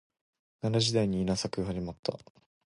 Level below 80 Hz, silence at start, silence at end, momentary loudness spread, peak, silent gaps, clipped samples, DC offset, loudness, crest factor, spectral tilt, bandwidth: -54 dBFS; 0.65 s; 0.5 s; 11 LU; -14 dBFS; 1.99-2.03 s; under 0.1%; under 0.1%; -31 LUFS; 18 dB; -5.5 dB/octave; 11.5 kHz